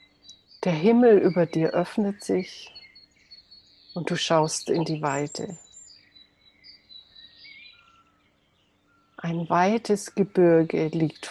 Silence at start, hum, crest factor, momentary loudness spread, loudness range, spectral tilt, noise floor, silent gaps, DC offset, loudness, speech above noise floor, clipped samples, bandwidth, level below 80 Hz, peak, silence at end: 0.3 s; none; 18 dB; 23 LU; 13 LU; -5.5 dB/octave; -66 dBFS; none; under 0.1%; -23 LUFS; 43 dB; under 0.1%; 12.5 kHz; -68 dBFS; -8 dBFS; 0 s